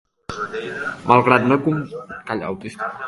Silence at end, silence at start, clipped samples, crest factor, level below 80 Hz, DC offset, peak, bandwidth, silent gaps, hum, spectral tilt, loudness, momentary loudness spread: 0 s; 0.3 s; under 0.1%; 20 dB; -54 dBFS; under 0.1%; 0 dBFS; 11.5 kHz; none; none; -7 dB/octave; -20 LUFS; 16 LU